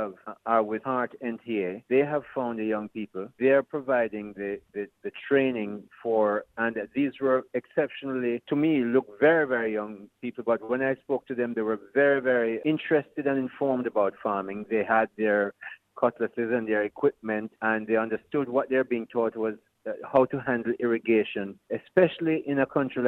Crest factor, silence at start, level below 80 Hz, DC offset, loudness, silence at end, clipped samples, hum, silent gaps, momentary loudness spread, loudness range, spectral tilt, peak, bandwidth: 18 dB; 0 s; -70 dBFS; under 0.1%; -27 LUFS; 0 s; under 0.1%; none; none; 12 LU; 2 LU; -9 dB/octave; -8 dBFS; 4.1 kHz